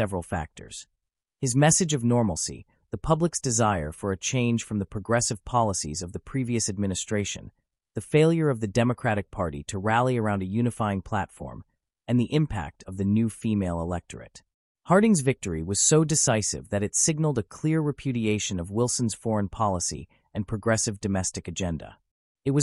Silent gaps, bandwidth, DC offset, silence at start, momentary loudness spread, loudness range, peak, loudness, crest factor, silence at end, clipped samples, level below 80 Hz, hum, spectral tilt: 14.54-14.75 s, 22.11-22.35 s; 13.5 kHz; under 0.1%; 0 s; 13 LU; 4 LU; -8 dBFS; -26 LUFS; 18 dB; 0 s; under 0.1%; -48 dBFS; none; -4.5 dB/octave